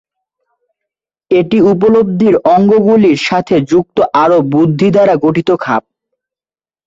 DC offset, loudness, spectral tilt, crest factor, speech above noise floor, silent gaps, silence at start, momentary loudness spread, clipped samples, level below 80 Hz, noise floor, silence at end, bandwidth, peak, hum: under 0.1%; -10 LUFS; -7.5 dB/octave; 10 dB; over 81 dB; none; 1.3 s; 5 LU; under 0.1%; -48 dBFS; under -90 dBFS; 1.05 s; 7.8 kHz; 0 dBFS; none